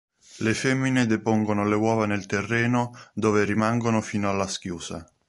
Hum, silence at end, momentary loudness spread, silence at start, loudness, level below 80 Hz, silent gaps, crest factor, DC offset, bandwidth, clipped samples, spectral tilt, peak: none; 0.25 s; 7 LU; 0.35 s; -24 LUFS; -54 dBFS; none; 16 dB; under 0.1%; 11.5 kHz; under 0.1%; -5.5 dB/octave; -8 dBFS